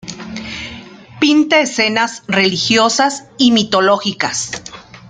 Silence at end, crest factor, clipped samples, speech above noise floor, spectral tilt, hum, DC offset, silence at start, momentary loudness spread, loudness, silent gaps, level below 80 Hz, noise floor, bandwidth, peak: 0 s; 16 dB; under 0.1%; 21 dB; -3 dB/octave; none; under 0.1%; 0.05 s; 16 LU; -13 LUFS; none; -52 dBFS; -35 dBFS; 9.6 kHz; 0 dBFS